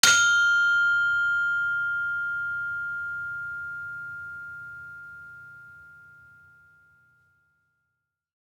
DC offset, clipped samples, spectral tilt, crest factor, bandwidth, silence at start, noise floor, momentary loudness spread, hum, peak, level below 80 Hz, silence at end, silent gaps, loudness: under 0.1%; under 0.1%; 1.5 dB/octave; 26 dB; 19.5 kHz; 0.05 s; -81 dBFS; 23 LU; none; -2 dBFS; -68 dBFS; 2.45 s; none; -24 LUFS